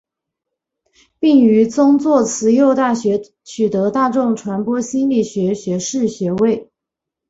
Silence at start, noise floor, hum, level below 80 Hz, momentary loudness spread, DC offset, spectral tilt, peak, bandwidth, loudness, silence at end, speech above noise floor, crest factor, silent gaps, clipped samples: 1.2 s; -83 dBFS; none; -58 dBFS; 8 LU; under 0.1%; -6 dB/octave; -2 dBFS; 8 kHz; -16 LUFS; 0.65 s; 68 dB; 14 dB; none; under 0.1%